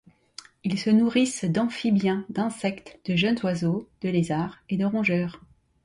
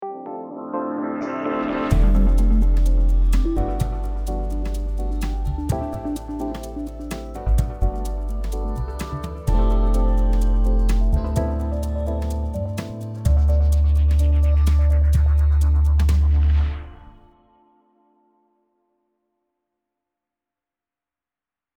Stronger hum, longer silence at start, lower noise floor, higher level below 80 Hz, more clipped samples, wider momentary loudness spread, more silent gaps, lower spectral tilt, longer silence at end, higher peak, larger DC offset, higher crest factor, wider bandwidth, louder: neither; first, 0.65 s vs 0 s; second, -49 dBFS vs under -90 dBFS; second, -60 dBFS vs -20 dBFS; neither; about the same, 11 LU vs 11 LU; neither; second, -6 dB/octave vs -8 dB/octave; second, 0.45 s vs 4.75 s; second, -10 dBFS vs -6 dBFS; neither; about the same, 16 dB vs 14 dB; about the same, 11.5 kHz vs 12 kHz; second, -25 LUFS vs -22 LUFS